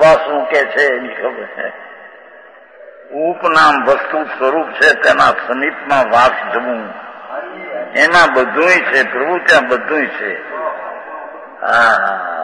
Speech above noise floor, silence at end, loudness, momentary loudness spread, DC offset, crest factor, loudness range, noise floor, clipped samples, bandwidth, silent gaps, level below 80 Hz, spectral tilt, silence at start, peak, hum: 26 dB; 0 s; -13 LUFS; 17 LU; under 0.1%; 14 dB; 4 LU; -40 dBFS; under 0.1%; 10.5 kHz; none; -52 dBFS; -3.5 dB/octave; 0 s; 0 dBFS; none